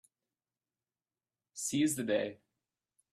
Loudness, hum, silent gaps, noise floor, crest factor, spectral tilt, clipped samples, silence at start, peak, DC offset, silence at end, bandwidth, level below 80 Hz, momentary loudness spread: -34 LUFS; none; none; under -90 dBFS; 20 dB; -4 dB/octave; under 0.1%; 1.55 s; -20 dBFS; under 0.1%; 0.8 s; 15.5 kHz; -78 dBFS; 11 LU